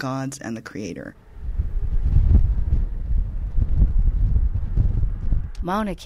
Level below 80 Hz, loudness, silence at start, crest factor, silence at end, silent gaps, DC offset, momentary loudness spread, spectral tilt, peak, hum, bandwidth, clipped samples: -22 dBFS; -25 LUFS; 0 s; 16 dB; 0 s; none; under 0.1%; 12 LU; -7.5 dB/octave; -4 dBFS; none; 11 kHz; under 0.1%